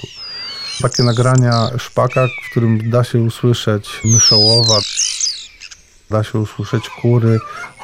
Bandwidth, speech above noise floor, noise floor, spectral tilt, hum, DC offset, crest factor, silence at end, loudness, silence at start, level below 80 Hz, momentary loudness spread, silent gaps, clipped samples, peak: 13 kHz; 25 dB; -39 dBFS; -4 dB/octave; none; under 0.1%; 14 dB; 0 s; -14 LUFS; 0 s; -46 dBFS; 14 LU; none; under 0.1%; -2 dBFS